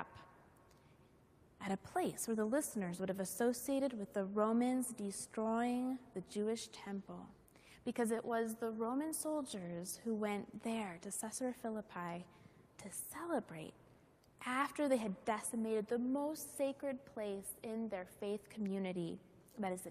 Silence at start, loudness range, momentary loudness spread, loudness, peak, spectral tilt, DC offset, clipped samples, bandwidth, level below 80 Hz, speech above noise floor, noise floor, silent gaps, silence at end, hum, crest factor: 0 s; 6 LU; 11 LU; -41 LUFS; -22 dBFS; -4.5 dB/octave; under 0.1%; under 0.1%; 15 kHz; -76 dBFS; 27 dB; -68 dBFS; none; 0 s; none; 20 dB